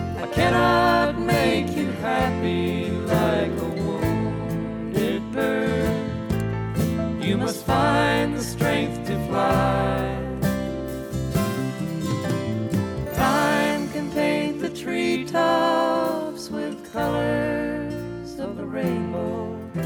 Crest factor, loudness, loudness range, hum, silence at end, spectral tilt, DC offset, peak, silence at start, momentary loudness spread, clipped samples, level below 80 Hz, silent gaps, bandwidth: 16 dB; -24 LUFS; 4 LU; none; 0 s; -6 dB/octave; under 0.1%; -6 dBFS; 0 s; 9 LU; under 0.1%; -42 dBFS; none; over 20 kHz